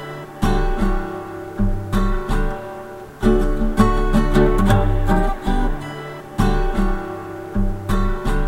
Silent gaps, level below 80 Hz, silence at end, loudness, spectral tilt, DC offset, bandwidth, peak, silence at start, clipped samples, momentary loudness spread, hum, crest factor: none; -20 dBFS; 0 s; -21 LUFS; -7 dB/octave; under 0.1%; 13 kHz; 0 dBFS; 0 s; under 0.1%; 13 LU; none; 18 dB